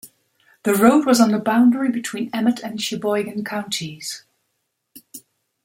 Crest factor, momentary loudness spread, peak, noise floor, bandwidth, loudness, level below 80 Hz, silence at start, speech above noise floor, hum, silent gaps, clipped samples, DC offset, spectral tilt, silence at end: 20 dB; 20 LU; -2 dBFS; -74 dBFS; 16.5 kHz; -19 LUFS; -64 dBFS; 0.05 s; 55 dB; none; none; under 0.1%; under 0.1%; -4.5 dB/octave; 0.45 s